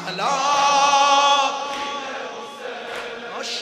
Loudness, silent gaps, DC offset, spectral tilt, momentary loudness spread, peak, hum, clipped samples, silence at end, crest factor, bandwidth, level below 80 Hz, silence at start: -18 LUFS; none; under 0.1%; -0.5 dB/octave; 17 LU; -4 dBFS; none; under 0.1%; 0 s; 16 dB; 14 kHz; -66 dBFS; 0 s